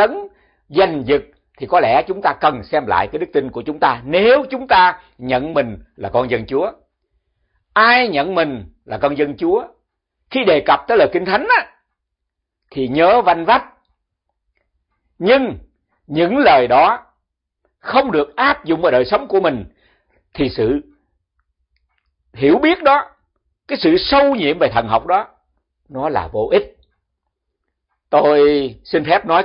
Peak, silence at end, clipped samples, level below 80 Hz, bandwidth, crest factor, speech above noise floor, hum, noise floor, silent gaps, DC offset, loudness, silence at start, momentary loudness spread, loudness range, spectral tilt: 0 dBFS; 0 s; under 0.1%; -46 dBFS; 5.6 kHz; 16 dB; 63 dB; none; -78 dBFS; none; under 0.1%; -15 LUFS; 0 s; 12 LU; 4 LU; -9.5 dB/octave